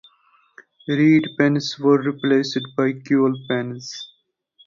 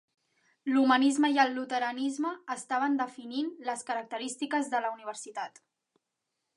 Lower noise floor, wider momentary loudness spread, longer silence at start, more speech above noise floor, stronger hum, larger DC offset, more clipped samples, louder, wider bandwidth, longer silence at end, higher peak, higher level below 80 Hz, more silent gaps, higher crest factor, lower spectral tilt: second, -59 dBFS vs -85 dBFS; about the same, 16 LU vs 15 LU; first, 0.9 s vs 0.65 s; second, 40 dB vs 55 dB; neither; neither; neither; first, -20 LUFS vs -30 LUFS; second, 7.4 kHz vs 11.5 kHz; second, 0.6 s vs 1.1 s; first, -4 dBFS vs -10 dBFS; first, -66 dBFS vs -86 dBFS; neither; about the same, 18 dB vs 20 dB; first, -6 dB/octave vs -2 dB/octave